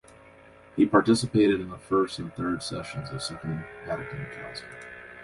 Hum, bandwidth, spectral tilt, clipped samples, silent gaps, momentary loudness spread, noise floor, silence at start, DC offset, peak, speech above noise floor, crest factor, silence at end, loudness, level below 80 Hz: none; 11.5 kHz; -5.5 dB/octave; under 0.1%; none; 17 LU; -52 dBFS; 0.75 s; under 0.1%; -6 dBFS; 25 dB; 22 dB; 0 s; -27 LUFS; -56 dBFS